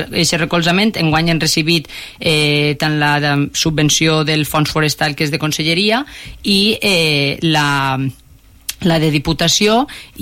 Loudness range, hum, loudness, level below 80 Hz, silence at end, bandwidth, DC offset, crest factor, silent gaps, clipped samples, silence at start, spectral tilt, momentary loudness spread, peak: 1 LU; none; -14 LUFS; -40 dBFS; 0 s; 16.5 kHz; under 0.1%; 12 dB; none; under 0.1%; 0 s; -4 dB/octave; 7 LU; -2 dBFS